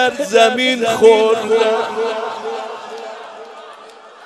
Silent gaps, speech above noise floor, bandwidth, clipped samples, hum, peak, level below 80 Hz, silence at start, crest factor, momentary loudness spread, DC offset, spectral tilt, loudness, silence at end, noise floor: none; 25 dB; 13 kHz; under 0.1%; none; 0 dBFS; -66 dBFS; 0 s; 16 dB; 22 LU; under 0.1%; -2.5 dB/octave; -14 LUFS; 0 s; -39 dBFS